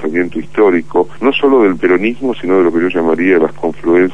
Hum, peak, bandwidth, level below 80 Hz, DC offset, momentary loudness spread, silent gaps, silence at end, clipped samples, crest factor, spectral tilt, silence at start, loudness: none; 0 dBFS; 8 kHz; -48 dBFS; 5%; 6 LU; none; 0 s; under 0.1%; 12 dB; -7 dB/octave; 0 s; -12 LUFS